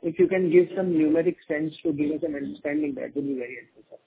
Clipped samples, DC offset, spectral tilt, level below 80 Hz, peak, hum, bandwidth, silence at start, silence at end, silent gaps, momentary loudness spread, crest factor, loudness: under 0.1%; under 0.1%; -11.5 dB/octave; -64 dBFS; -6 dBFS; none; 4 kHz; 0.05 s; 0.1 s; none; 11 LU; 18 dB; -25 LUFS